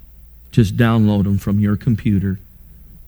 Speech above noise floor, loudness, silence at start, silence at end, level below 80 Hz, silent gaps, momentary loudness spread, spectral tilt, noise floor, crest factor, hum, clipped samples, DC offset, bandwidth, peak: 26 dB; -17 LUFS; 0.55 s; 0.7 s; -38 dBFS; none; 6 LU; -8 dB/octave; -42 dBFS; 16 dB; none; under 0.1%; under 0.1%; over 20 kHz; -2 dBFS